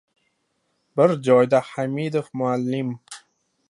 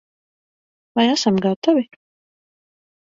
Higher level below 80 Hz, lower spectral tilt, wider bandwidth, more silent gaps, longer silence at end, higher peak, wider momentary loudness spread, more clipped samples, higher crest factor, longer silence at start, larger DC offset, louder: second, -72 dBFS vs -64 dBFS; first, -7 dB/octave vs -5 dB/octave; first, 11.5 kHz vs 7.8 kHz; second, none vs 1.56-1.62 s; second, 0.5 s vs 1.3 s; about the same, -4 dBFS vs -2 dBFS; first, 17 LU vs 9 LU; neither; about the same, 20 dB vs 20 dB; about the same, 0.95 s vs 0.95 s; neither; about the same, -21 LUFS vs -19 LUFS